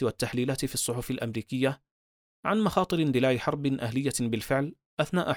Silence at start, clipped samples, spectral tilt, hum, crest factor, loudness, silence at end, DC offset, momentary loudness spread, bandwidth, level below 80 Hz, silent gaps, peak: 0 s; under 0.1%; -5 dB/octave; none; 18 dB; -29 LUFS; 0 s; under 0.1%; 7 LU; over 20 kHz; -56 dBFS; 1.91-2.43 s, 4.86-4.97 s; -10 dBFS